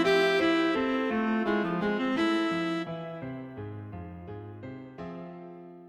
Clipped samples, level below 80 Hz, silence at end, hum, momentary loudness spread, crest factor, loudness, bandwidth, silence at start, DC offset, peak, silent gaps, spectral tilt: under 0.1%; -60 dBFS; 0 s; none; 18 LU; 16 dB; -28 LUFS; 13 kHz; 0 s; under 0.1%; -14 dBFS; none; -6 dB/octave